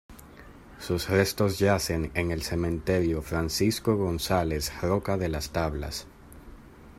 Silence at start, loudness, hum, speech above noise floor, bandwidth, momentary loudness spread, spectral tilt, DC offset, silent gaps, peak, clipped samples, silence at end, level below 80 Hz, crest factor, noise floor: 0.1 s; -27 LUFS; none; 22 dB; 16 kHz; 7 LU; -5 dB/octave; under 0.1%; none; -8 dBFS; under 0.1%; 0.05 s; -44 dBFS; 20 dB; -48 dBFS